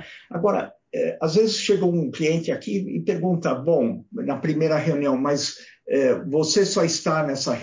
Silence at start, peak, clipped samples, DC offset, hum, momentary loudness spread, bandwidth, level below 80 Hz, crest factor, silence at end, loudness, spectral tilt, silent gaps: 0 s; -8 dBFS; under 0.1%; under 0.1%; none; 7 LU; 7.6 kHz; -66 dBFS; 14 dB; 0 s; -22 LUFS; -5 dB/octave; none